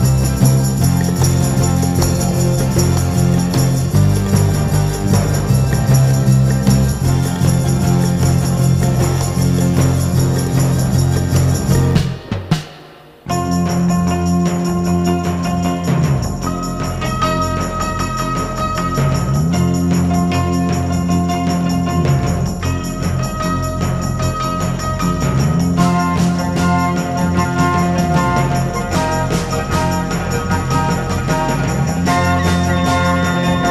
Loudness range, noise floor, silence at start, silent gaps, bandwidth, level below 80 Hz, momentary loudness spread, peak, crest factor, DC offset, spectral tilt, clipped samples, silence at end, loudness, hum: 4 LU; -39 dBFS; 0 s; none; 15.5 kHz; -28 dBFS; 5 LU; -2 dBFS; 14 dB; under 0.1%; -6 dB/octave; under 0.1%; 0 s; -16 LUFS; none